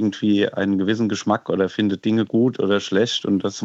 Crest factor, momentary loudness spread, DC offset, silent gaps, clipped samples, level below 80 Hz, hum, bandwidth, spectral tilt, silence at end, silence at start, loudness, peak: 16 dB; 2 LU; under 0.1%; none; under 0.1%; -70 dBFS; none; 8 kHz; -5.5 dB/octave; 0 s; 0 s; -20 LUFS; -4 dBFS